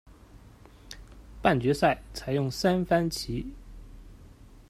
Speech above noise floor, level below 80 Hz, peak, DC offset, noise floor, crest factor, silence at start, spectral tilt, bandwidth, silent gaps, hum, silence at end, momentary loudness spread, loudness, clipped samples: 25 dB; -48 dBFS; -6 dBFS; under 0.1%; -52 dBFS; 24 dB; 0.35 s; -6 dB/octave; 15.5 kHz; none; none; 0.45 s; 22 LU; -27 LUFS; under 0.1%